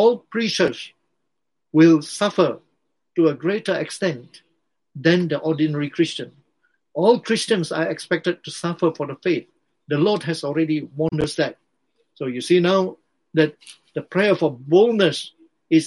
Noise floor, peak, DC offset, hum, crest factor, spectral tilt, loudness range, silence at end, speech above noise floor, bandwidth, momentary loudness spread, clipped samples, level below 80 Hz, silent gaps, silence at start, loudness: -81 dBFS; -2 dBFS; under 0.1%; none; 18 dB; -5.5 dB/octave; 3 LU; 0 s; 61 dB; 11.5 kHz; 12 LU; under 0.1%; -60 dBFS; none; 0 s; -21 LUFS